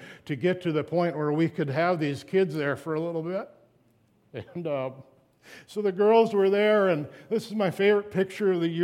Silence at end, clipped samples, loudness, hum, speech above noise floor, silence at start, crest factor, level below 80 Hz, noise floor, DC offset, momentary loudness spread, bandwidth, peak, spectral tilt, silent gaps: 0 s; under 0.1%; -26 LUFS; none; 39 dB; 0 s; 18 dB; -74 dBFS; -64 dBFS; under 0.1%; 14 LU; 13.5 kHz; -10 dBFS; -7 dB/octave; none